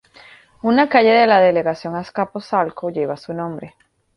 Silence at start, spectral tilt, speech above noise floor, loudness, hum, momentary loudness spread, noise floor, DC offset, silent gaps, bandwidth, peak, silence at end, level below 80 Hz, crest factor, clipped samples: 0.65 s; -7 dB/octave; 29 dB; -17 LUFS; none; 15 LU; -46 dBFS; under 0.1%; none; 10.5 kHz; -2 dBFS; 0.5 s; -60 dBFS; 16 dB; under 0.1%